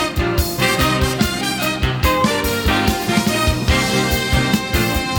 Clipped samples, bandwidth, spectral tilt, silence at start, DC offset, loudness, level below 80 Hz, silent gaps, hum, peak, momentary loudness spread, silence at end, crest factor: under 0.1%; 19 kHz; -4.5 dB/octave; 0 s; under 0.1%; -17 LUFS; -26 dBFS; none; none; -2 dBFS; 3 LU; 0 s; 14 dB